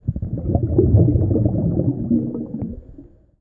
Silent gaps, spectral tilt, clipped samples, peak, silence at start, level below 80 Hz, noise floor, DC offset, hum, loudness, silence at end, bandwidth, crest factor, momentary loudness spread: none; -16.5 dB/octave; under 0.1%; -4 dBFS; 0.05 s; -30 dBFS; -44 dBFS; under 0.1%; none; -19 LUFS; 0.35 s; 1.5 kHz; 16 dB; 14 LU